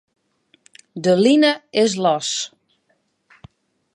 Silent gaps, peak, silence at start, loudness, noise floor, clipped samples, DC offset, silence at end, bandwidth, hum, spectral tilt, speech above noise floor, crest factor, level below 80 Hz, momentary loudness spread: none; -2 dBFS; 0.95 s; -17 LUFS; -67 dBFS; under 0.1%; under 0.1%; 1.45 s; 11.5 kHz; none; -4 dB/octave; 50 dB; 18 dB; -66 dBFS; 12 LU